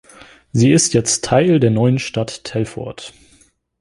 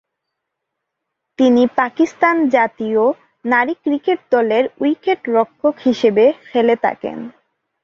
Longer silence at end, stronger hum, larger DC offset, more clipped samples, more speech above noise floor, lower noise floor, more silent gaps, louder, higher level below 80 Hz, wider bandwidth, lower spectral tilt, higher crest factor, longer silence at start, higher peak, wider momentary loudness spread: first, 0.7 s vs 0.55 s; neither; neither; neither; second, 38 dB vs 62 dB; second, -54 dBFS vs -78 dBFS; neither; about the same, -16 LUFS vs -16 LUFS; first, -48 dBFS vs -62 dBFS; first, 11.5 kHz vs 7.2 kHz; about the same, -5 dB/octave vs -6 dB/octave; about the same, 16 dB vs 16 dB; second, 0.55 s vs 1.4 s; about the same, -2 dBFS vs -2 dBFS; first, 17 LU vs 6 LU